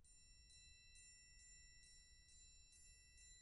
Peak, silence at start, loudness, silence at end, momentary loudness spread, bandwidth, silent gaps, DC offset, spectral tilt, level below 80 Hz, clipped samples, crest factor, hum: -54 dBFS; 0 s; -66 LUFS; 0 s; 3 LU; 11.5 kHz; none; under 0.1%; 0 dB/octave; -72 dBFS; under 0.1%; 12 dB; none